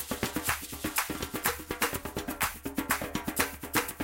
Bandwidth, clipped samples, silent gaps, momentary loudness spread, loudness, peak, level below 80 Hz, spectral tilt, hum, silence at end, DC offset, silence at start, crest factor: 17 kHz; under 0.1%; none; 3 LU; -32 LUFS; -6 dBFS; -50 dBFS; -2.5 dB/octave; none; 0 s; under 0.1%; 0 s; 26 dB